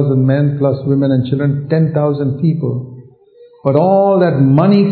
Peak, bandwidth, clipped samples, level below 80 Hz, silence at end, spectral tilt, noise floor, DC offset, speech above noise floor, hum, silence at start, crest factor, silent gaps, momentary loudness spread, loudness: 0 dBFS; 4.5 kHz; under 0.1%; -56 dBFS; 0 s; -12.5 dB/octave; -44 dBFS; under 0.1%; 32 dB; none; 0 s; 12 dB; none; 8 LU; -13 LUFS